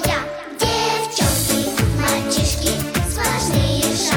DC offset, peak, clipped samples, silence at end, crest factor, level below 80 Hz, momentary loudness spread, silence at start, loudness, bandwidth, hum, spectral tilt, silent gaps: under 0.1%; -4 dBFS; under 0.1%; 0 s; 16 dB; -30 dBFS; 4 LU; 0 s; -19 LUFS; 19.5 kHz; none; -3.5 dB/octave; none